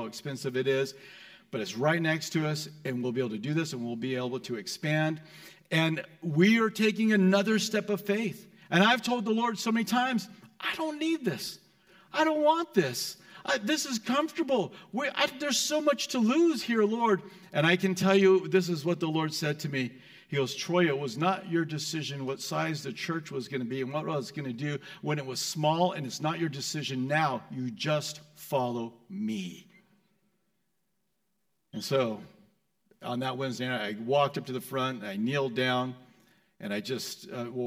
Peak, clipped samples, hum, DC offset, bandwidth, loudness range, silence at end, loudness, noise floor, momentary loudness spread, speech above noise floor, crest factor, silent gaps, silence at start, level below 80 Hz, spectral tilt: -10 dBFS; under 0.1%; none; under 0.1%; 16.5 kHz; 9 LU; 0 s; -29 LUFS; -80 dBFS; 12 LU; 51 dB; 20 dB; none; 0 s; -78 dBFS; -5 dB/octave